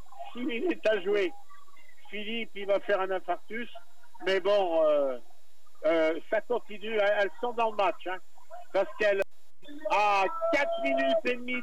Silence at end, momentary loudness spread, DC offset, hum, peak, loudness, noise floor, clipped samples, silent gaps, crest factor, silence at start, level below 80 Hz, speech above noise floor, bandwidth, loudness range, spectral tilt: 0 s; 13 LU; 2%; none; -14 dBFS; -29 LUFS; -65 dBFS; under 0.1%; none; 14 dB; 0.15 s; -72 dBFS; 36 dB; 13.5 kHz; 3 LU; -4 dB/octave